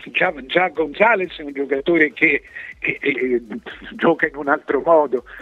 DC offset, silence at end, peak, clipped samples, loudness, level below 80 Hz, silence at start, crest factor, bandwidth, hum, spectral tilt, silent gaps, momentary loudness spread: under 0.1%; 0 s; 0 dBFS; under 0.1%; -18 LUFS; -52 dBFS; 0 s; 18 dB; 6.8 kHz; none; -7 dB/octave; none; 11 LU